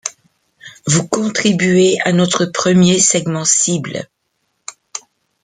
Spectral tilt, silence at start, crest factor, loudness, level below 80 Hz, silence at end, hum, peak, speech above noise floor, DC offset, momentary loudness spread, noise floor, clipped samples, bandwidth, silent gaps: -4 dB/octave; 0.05 s; 16 dB; -13 LUFS; -54 dBFS; 0.45 s; none; 0 dBFS; 54 dB; under 0.1%; 19 LU; -68 dBFS; under 0.1%; 9.6 kHz; none